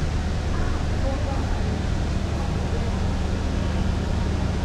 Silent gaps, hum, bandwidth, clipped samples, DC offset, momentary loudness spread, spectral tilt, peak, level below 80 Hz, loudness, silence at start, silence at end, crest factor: none; none; 10.5 kHz; under 0.1%; under 0.1%; 1 LU; -6.5 dB/octave; -12 dBFS; -26 dBFS; -26 LUFS; 0 s; 0 s; 12 dB